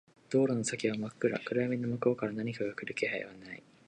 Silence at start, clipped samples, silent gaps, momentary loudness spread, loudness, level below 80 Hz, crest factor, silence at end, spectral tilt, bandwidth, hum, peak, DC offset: 0.3 s; under 0.1%; none; 8 LU; -33 LUFS; -74 dBFS; 20 dB; 0.25 s; -5.5 dB/octave; 10.5 kHz; none; -14 dBFS; under 0.1%